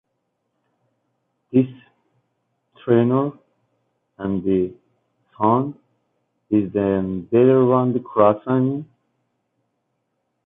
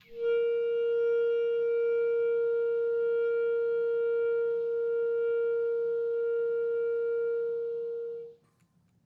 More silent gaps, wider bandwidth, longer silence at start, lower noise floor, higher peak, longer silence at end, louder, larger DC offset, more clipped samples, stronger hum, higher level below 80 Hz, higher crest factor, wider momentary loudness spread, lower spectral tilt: neither; about the same, 3.8 kHz vs 3.9 kHz; first, 1.55 s vs 0.1 s; first, -74 dBFS vs -68 dBFS; first, -4 dBFS vs -22 dBFS; first, 1.6 s vs 0.7 s; first, -20 LUFS vs -29 LUFS; neither; neither; neither; first, -56 dBFS vs -80 dBFS; first, 18 dB vs 6 dB; first, 12 LU vs 5 LU; first, -12 dB/octave vs -6 dB/octave